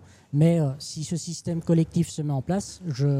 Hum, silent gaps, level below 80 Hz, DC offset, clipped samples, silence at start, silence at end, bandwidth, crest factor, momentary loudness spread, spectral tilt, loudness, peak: none; none; -54 dBFS; under 0.1%; under 0.1%; 0.3 s; 0 s; 12 kHz; 16 dB; 9 LU; -7 dB/octave; -26 LUFS; -10 dBFS